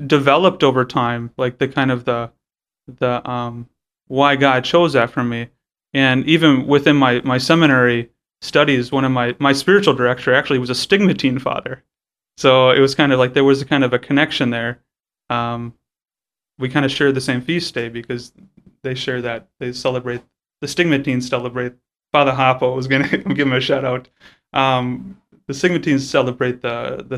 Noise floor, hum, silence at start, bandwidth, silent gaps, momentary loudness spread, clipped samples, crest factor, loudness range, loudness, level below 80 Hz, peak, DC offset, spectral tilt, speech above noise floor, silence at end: under -90 dBFS; none; 0 s; 13.5 kHz; none; 14 LU; under 0.1%; 18 dB; 7 LU; -17 LUFS; -54 dBFS; 0 dBFS; under 0.1%; -5.5 dB/octave; over 73 dB; 0 s